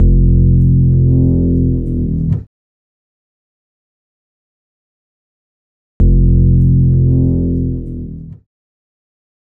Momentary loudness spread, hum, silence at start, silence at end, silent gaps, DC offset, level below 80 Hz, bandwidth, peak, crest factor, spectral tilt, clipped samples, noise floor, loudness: 11 LU; none; 0 s; 1.15 s; 2.47-6.00 s; under 0.1%; -18 dBFS; 1 kHz; 0 dBFS; 14 dB; -14.5 dB/octave; under 0.1%; under -90 dBFS; -13 LUFS